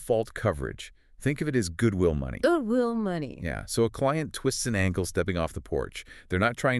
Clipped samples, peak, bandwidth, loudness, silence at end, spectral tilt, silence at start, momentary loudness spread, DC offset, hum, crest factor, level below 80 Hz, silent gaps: under 0.1%; -10 dBFS; 13.5 kHz; -28 LUFS; 0 s; -5.5 dB/octave; 0 s; 9 LU; under 0.1%; none; 18 dB; -44 dBFS; none